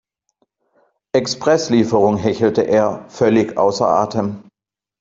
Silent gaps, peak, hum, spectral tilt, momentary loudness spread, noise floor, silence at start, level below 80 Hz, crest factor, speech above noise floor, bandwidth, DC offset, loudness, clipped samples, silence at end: none; -2 dBFS; none; -5.5 dB/octave; 6 LU; -87 dBFS; 1.15 s; -56 dBFS; 16 dB; 72 dB; 7.8 kHz; under 0.1%; -17 LUFS; under 0.1%; 0.6 s